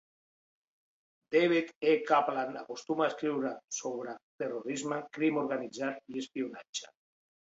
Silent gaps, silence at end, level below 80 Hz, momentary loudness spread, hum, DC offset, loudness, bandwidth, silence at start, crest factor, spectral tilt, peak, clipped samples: 1.76-1.81 s, 4.23-4.39 s, 6.69-6.73 s; 0.7 s; -82 dBFS; 13 LU; none; under 0.1%; -33 LUFS; 8 kHz; 1.3 s; 22 dB; -4 dB/octave; -12 dBFS; under 0.1%